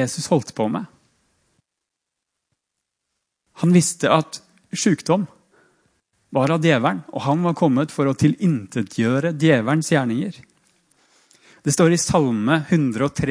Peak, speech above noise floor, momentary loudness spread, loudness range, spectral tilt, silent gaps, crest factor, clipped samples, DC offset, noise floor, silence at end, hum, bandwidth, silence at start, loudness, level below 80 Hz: -2 dBFS; 63 dB; 10 LU; 5 LU; -5.5 dB/octave; none; 20 dB; under 0.1%; under 0.1%; -82 dBFS; 0 s; none; 10.5 kHz; 0 s; -20 LUFS; -56 dBFS